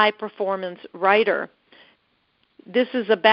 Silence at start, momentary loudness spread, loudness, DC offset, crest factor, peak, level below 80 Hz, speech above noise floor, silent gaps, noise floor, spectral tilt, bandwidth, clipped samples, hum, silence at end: 0 s; 11 LU; -22 LUFS; under 0.1%; 20 dB; -2 dBFS; -74 dBFS; 46 dB; none; -67 dBFS; -1 dB/octave; 5.6 kHz; under 0.1%; none; 0 s